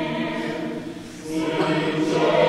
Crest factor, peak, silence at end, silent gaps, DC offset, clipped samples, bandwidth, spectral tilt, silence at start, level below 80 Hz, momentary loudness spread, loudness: 16 dB; -6 dBFS; 0 s; none; under 0.1%; under 0.1%; 12.5 kHz; -5.5 dB/octave; 0 s; -56 dBFS; 12 LU; -24 LUFS